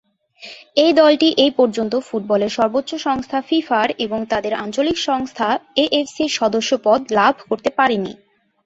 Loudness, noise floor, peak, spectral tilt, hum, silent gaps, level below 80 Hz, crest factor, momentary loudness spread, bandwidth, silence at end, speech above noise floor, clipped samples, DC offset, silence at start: -18 LUFS; -41 dBFS; -2 dBFS; -4 dB/octave; none; none; -56 dBFS; 16 dB; 8 LU; 8 kHz; 0.5 s; 24 dB; under 0.1%; under 0.1%; 0.4 s